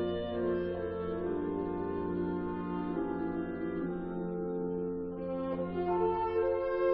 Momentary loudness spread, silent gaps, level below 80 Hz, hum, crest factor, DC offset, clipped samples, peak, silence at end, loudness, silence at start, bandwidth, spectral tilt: 6 LU; none; -56 dBFS; none; 14 dB; under 0.1%; under 0.1%; -18 dBFS; 0 s; -35 LUFS; 0 s; 5 kHz; -7 dB/octave